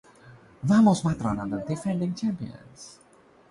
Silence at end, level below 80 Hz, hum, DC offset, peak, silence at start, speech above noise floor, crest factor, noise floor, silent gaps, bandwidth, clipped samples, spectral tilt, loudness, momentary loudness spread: 0.6 s; -54 dBFS; none; under 0.1%; -10 dBFS; 0.25 s; 27 dB; 18 dB; -52 dBFS; none; 11.5 kHz; under 0.1%; -7 dB/octave; -25 LUFS; 25 LU